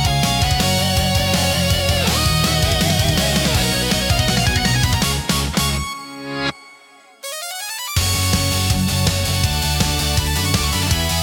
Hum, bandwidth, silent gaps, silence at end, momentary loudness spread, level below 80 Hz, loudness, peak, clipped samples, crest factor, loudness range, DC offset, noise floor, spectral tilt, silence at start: none; 18 kHz; none; 0 s; 8 LU; -28 dBFS; -17 LUFS; -4 dBFS; under 0.1%; 14 dB; 5 LU; under 0.1%; -46 dBFS; -3.5 dB/octave; 0 s